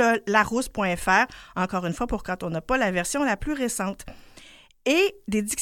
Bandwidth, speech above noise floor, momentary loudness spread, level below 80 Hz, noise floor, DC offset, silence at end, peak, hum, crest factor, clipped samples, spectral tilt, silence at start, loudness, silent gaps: 17 kHz; 26 dB; 9 LU; -44 dBFS; -50 dBFS; under 0.1%; 0 s; -4 dBFS; none; 20 dB; under 0.1%; -4 dB/octave; 0 s; -25 LUFS; none